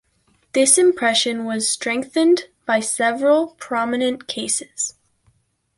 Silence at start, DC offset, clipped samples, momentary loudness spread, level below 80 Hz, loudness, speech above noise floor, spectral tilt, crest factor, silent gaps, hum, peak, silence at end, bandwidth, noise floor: 0.55 s; under 0.1%; under 0.1%; 10 LU; -66 dBFS; -19 LUFS; 44 dB; -1.5 dB/octave; 20 dB; none; none; 0 dBFS; 0.9 s; 11.5 kHz; -62 dBFS